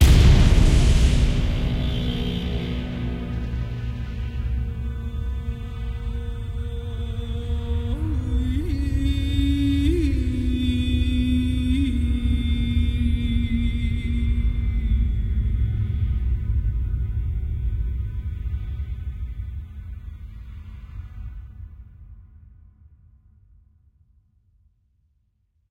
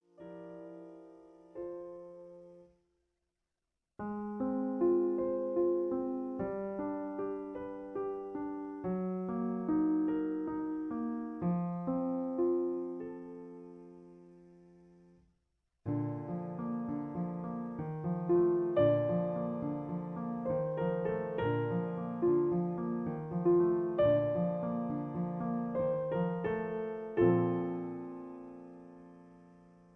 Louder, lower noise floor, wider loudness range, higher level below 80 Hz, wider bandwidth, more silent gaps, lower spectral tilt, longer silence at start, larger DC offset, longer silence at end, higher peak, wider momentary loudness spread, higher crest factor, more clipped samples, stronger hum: first, -24 LUFS vs -34 LUFS; second, -67 dBFS vs -88 dBFS; first, 15 LU vs 11 LU; first, -24 dBFS vs -66 dBFS; first, 12.5 kHz vs 3.5 kHz; neither; second, -6.5 dB/octave vs -11 dB/octave; second, 0 s vs 0.2 s; neither; first, 3.45 s vs 0.45 s; first, -4 dBFS vs -16 dBFS; second, 15 LU vs 20 LU; about the same, 18 dB vs 20 dB; neither; neither